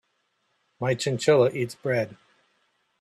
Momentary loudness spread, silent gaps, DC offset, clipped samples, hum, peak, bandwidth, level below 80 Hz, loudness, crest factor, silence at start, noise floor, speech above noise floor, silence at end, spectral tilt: 10 LU; none; under 0.1%; under 0.1%; none; -8 dBFS; 13.5 kHz; -68 dBFS; -25 LUFS; 18 dB; 0.8 s; -73 dBFS; 49 dB; 0.85 s; -5.5 dB/octave